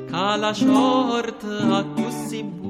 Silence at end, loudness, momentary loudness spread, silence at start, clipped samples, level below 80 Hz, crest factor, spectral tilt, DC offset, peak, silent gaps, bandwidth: 0 s; -21 LUFS; 11 LU; 0 s; under 0.1%; -62 dBFS; 14 dB; -5 dB/octave; under 0.1%; -6 dBFS; none; 14.5 kHz